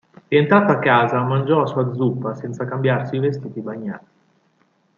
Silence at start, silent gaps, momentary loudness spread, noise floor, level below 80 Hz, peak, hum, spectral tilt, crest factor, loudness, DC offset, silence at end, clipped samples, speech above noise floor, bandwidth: 0.3 s; none; 14 LU; -62 dBFS; -64 dBFS; -2 dBFS; none; -8.5 dB/octave; 18 dB; -19 LUFS; under 0.1%; 1 s; under 0.1%; 44 dB; 7.2 kHz